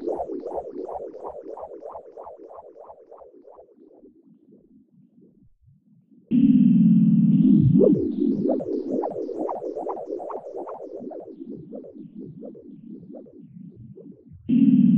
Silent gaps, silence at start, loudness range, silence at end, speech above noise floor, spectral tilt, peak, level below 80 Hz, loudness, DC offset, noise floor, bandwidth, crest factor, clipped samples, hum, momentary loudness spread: none; 0 s; 22 LU; 0 s; 33 dB; -12.5 dB/octave; -6 dBFS; -56 dBFS; -21 LUFS; under 0.1%; -57 dBFS; 3.4 kHz; 18 dB; under 0.1%; none; 26 LU